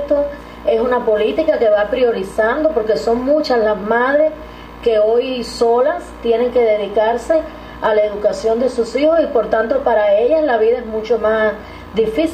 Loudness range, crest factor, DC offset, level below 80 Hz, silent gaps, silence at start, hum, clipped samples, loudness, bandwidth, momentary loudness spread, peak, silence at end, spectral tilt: 1 LU; 12 dB; under 0.1%; -42 dBFS; none; 0 s; 60 Hz at -45 dBFS; under 0.1%; -16 LUFS; 12 kHz; 6 LU; -2 dBFS; 0 s; -5 dB/octave